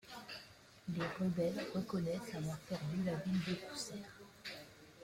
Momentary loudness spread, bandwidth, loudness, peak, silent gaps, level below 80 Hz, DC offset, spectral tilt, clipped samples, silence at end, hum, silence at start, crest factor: 13 LU; 16 kHz; -41 LUFS; -26 dBFS; none; -70 dBFS; under 0.1%; -6 dB/octave; under 0.1%; 0 s; none; 0.05 s; 14 dB